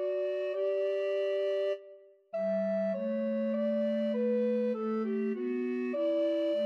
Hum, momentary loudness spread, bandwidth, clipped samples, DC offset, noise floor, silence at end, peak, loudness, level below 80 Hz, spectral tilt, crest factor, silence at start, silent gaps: none; 4 LU; 6.2 kHz; under 0.1%; under 0.1%; -55 dBFS; 0 s; -22 dBFS; -32 LUFS; under -90 dBFS; -8 dB/octave; 8 dB; 0 s; none